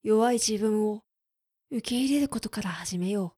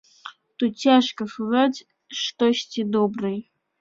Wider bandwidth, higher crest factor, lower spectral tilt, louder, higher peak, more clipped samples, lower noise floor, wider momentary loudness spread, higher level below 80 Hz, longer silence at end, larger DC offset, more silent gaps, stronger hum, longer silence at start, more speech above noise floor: first, 15 kHz vs 7.6 kHz; about the same, 16 dB vs 20 dB; about the same, -4.5 dB/octave vs -4.5 dB/octave; second, -28 LUFS vs -22 LUFS; second, -12 dBFS vs -4 dBFS; neither; first, -85 dBFS vs -44 dBFS; second, 10 LU vs 18 LU; first, -60 dBFS vs -68 dBFS; second, 0.1 s vs 0.4 s; neither; neither; neither; second, 0.05 s vs 0.25 s; first, 58 dB vs 23 dB